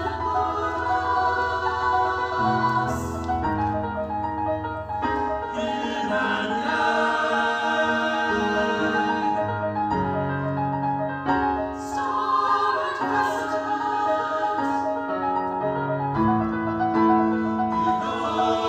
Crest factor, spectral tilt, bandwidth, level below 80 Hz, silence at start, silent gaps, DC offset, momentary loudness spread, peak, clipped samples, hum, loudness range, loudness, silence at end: 16 dB; -6 dB/octave; 15.5 kHz; -46 dBFS; 0 s; none; under 0.1%; 5 LU; -8 dBFS; under 0.1%; none; 3 LU; -24 LUFS; 0 s